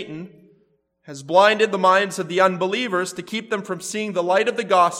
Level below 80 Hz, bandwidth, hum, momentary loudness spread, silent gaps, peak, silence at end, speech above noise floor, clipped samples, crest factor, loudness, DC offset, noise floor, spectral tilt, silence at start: -74 dBFS; 15.5 kHz; none; 13 LU; none; -2 dBFS; 0 s; 43 dB; under 0.1%; 18 dB; -20 LUFS; under 0.1%; -63 dBFS; -4 dB/octave; 0 s